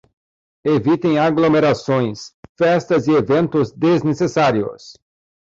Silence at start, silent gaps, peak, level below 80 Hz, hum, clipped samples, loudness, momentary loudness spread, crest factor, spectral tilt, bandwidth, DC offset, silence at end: 0.65 s; 2.34-2.43 s, 2.49-2.55 s; -6 dBFS; -54 dBFS; none; under 0.1%; -17 LUFS; 9 LU; 12 dB; -7 dB/octave; 7.6 kHz; under 0.1%; 0.5 s